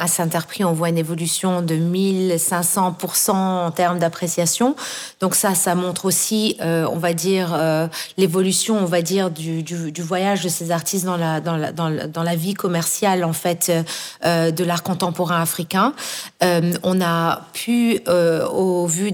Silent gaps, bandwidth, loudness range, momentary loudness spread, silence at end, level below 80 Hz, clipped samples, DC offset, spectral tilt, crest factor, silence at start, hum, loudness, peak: none; over 20 kHz; 2 LU; 6 LU; 0 s; -64 dBFS; under 0.1%; under 0.1%; -4.5 dB/octave; 16 dB; 0 s; none; -19 LUFS; -4 dBFS